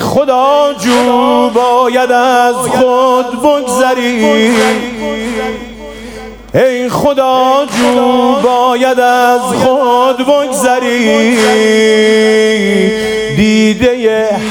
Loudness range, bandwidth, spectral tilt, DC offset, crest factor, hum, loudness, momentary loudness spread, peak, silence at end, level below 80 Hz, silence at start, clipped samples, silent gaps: 4 LU; 18.5 kHz; -4 dB/octave; under 0.1%; 10 dB; none; -9 LUFS; 8 LU; 0 dBFS; 0 s; -40 dBFS; 0 s; under 0.1%; none